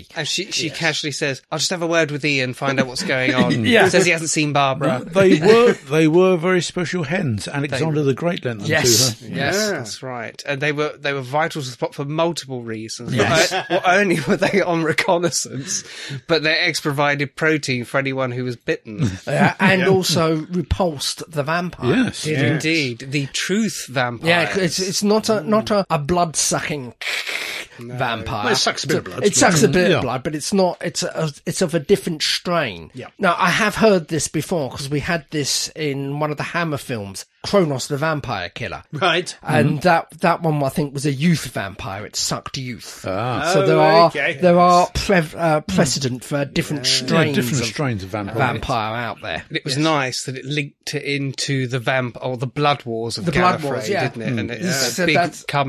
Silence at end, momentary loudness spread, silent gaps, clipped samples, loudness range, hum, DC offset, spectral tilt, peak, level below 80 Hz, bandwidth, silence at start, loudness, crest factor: 0 s; 11 LU; none; under 0.1%; 6 LU; none; under 0.1%; -4 dB/octave; 0 dBFS; -46 dBFS; 14 kHz; 0 s; -19 LUFS; 18 dB